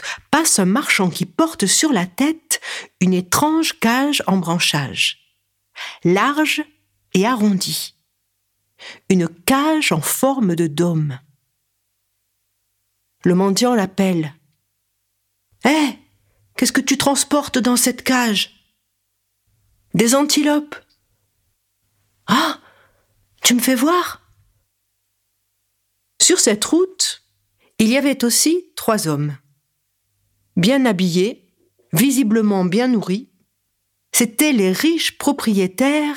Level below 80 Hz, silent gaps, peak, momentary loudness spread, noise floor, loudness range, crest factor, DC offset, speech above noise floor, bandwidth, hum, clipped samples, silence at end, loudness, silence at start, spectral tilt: -60 dBFS; none; 0 dBFS; 10 LU; -71 dBFS; 4 LU; 18 dB; under 0.1%; 54 dB; 18.5 kHz; none; under 0.1%; 0 s; -17 LUFS; 0 s; -3.5 dB/octave